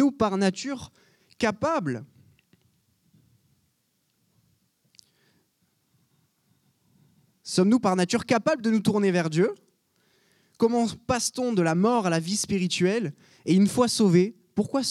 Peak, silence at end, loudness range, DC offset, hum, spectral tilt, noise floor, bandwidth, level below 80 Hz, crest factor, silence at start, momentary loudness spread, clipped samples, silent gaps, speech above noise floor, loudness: -8 dBFS; 0 s; 9 LU; under 0.1%; none; -5 dB/octave; -72 dBFS; 13.5 kHz; -62 dBFS; 18 dB; 0 s; 12 LU; under 0.1%; none; 49 dB; -24 LUFS